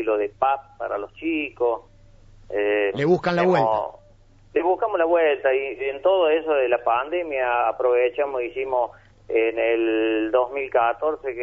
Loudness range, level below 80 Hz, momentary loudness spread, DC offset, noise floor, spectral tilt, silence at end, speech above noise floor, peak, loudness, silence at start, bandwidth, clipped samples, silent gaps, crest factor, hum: 2 LU; -56 dBFS; 8 LU; under 0.1%; -52 dBFS; -7.5 dB/octave; 0 s; 30 dB; -6 dBFS; -22 LUFS; 0 s; 7.6 kHz; under 0.1%; none; 16 dB; none